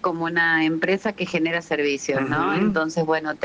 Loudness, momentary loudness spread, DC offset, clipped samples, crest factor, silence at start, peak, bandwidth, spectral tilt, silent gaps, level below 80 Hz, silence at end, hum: -22 LUFS; 5 LU; under 0.1%; under 0.1%; 14 dB; 0.05 s; -8 dBFS; 9.4 kHz; -5 dB/octave; none; -58 dBFS; 0 s; none